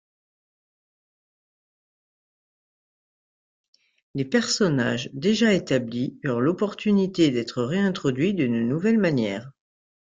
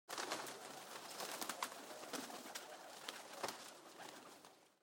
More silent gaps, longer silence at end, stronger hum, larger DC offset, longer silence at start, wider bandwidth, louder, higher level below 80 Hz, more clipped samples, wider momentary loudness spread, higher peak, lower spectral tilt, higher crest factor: neither; first, 0.55 s vs 0.1 s; neither; neither; first, 4.15 s vs 0.1 s; second, 9.4 kHz vs 17 kHz; first, -23 LUFS vs -49 LUFS; first, -62 dBFS vs under -90 dBFS; neither; second, 7 LU vs 11 LU; first, -8 dBFS vs -22 dBFS; first, -5.5 dB/octave vs -1 dB/octave; second, 18 dB vs 28 dB